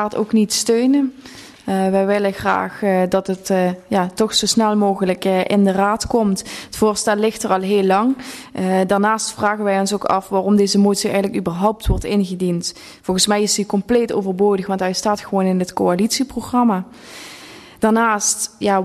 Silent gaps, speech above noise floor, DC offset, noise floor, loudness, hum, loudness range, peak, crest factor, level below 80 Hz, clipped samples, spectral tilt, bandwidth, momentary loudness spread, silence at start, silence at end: none; 22 dB; under 0.1%; -39 dBFS; -18 LUFS; none; 2 LU; -2 dBFS; 16 dB; -38 dBFS; under 0.1%; -4.5 dB/octave; 13.5 kHz; 8 LU; 0 s; 0 s